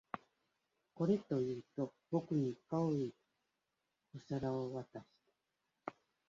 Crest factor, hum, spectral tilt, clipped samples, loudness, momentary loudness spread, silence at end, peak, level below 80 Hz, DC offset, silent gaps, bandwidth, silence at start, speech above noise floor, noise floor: 20 dB; none; -8.5 dB/octave; under 0.1%; -40 LUFS; 15 LU; 0.4 s; -22 dBFS; -76 dBFS; under 0.1%; none; 7.6 kHz; 0.15 s; 49 dB; -88 dBFS